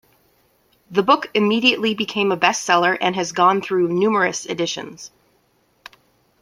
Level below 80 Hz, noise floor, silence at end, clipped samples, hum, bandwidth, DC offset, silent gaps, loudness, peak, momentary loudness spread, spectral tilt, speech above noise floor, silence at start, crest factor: -66 dBFS; -62 dBFS; 1.35 s; under 0.1%; none; 15.5 kHz; under 0.1%; none; -18 LUFS; -2 dBFS; 8 LU; -3.5 dB/octave; 43 dB; 0.9 s; 20 dB